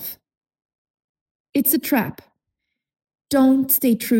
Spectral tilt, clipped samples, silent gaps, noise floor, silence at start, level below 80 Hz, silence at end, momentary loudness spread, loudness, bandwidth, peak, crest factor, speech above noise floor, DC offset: -4 dB/octave; under 0.1%; 0.37-0.41 s, 0.65-0.69 s, 0.75-0.94 s, 1.04-1.15 s, 1.21-1.45 s; -80 dBFS; 0 s; -60 dBFS; 0 s; 11 LU; -18 LUFS; 17 kHz; -2 dBFS; 20 dB; 62 dB; under 0.1%